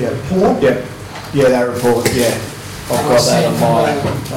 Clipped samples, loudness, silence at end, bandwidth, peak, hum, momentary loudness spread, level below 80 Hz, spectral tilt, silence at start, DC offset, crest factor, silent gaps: under 0.1%; -14 LUFS; 0 s; 16.5 kHz; -4 dBFS; none; 11 LU; -40 dBFS; -5 dB/octave; 0 s; under 0.1%; 10 dB; none